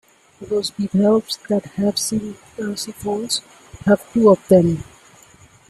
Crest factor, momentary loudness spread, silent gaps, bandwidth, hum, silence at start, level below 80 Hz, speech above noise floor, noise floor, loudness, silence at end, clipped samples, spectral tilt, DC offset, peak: 18 dB; 12 LU; none; 14 kHz; none; 0.4 s; -52 dBFS; 30 dB; -49 dBFS; -19 LUFS; 0.85 s; under 0.1%; -5.5 dB/octave; under 0.1%; -2 dBFS